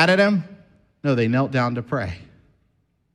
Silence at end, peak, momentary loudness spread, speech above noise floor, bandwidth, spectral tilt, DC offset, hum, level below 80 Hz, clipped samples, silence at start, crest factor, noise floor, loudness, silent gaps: 0.9 s; -4 dBFS; 15 LU; 47 dB; 11 kHz; -6.5 dB/octave; under 0.1%; none; -56 dBFS; under 0.1%; 0 s; 18 dB; -67 dBFS; -22 LUFS; none